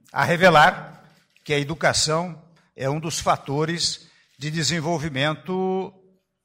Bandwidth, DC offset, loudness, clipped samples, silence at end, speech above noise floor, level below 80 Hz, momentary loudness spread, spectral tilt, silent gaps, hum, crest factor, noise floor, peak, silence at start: 16 kHz; under 0.1%; -21 LUFS; under 0.1%; 0.55 s; 33 dB; -52 dBFS; 14 LU; -4 dB/octave; none; none; 18 dB; -54 dBFS; -6 dBFS; 0.15 s